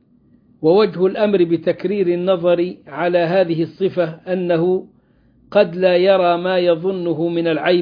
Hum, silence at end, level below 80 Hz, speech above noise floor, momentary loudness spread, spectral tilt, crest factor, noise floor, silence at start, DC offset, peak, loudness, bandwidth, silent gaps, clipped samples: none; 0 s; -62 dBFS; 38 dB; 6 LU; -9.5 dB/octave; 16 dB; -54 dBFS; 0.6 s; under 0.1%; -2 dBFS; -17 LUFS; 5.2 kHz; none; under 0.1%